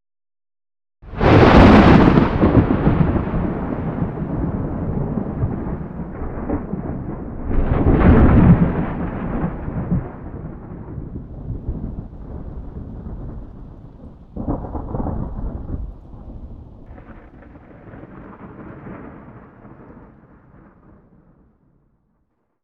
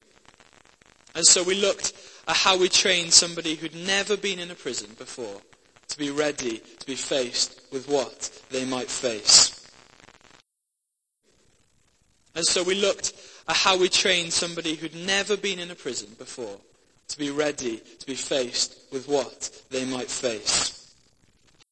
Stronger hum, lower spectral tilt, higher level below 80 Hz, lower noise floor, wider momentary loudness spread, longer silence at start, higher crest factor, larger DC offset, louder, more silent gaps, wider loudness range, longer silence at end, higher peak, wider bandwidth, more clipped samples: neither; first, -9 dB/octave vs -1 dB/octave; first, -26 dBFS vs -60 dBFS; second, -68 dBFS vs -81 dBFS; first, 25 LU vs 20 LU; about the same, 1.05 s vs 1.15 s; second, 18 dB vs 26 dB; neither; first, -17 LUFS vs -23 LUFS; neither; first, 26 LU vs 10 LU; first, 2.6 s vs 0.9 s; about the same, 0 dBFS vs 0 dBFS; second, 7.2 kHz vs 8.8 kHz; neither